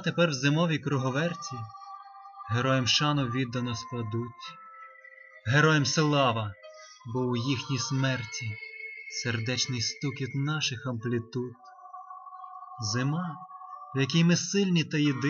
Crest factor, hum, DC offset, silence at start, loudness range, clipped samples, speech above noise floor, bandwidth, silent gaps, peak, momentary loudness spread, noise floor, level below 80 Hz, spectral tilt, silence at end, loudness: 18 dB; none; under 0.1%; 0 s; 5 LU; under 0.1%; 24 dB; 7.4 kHz; none; -10 dBFS; 21 LU; -51 dBFS; -66 dBFS; -4.5 dB/octave; 0 s; -28 LUFS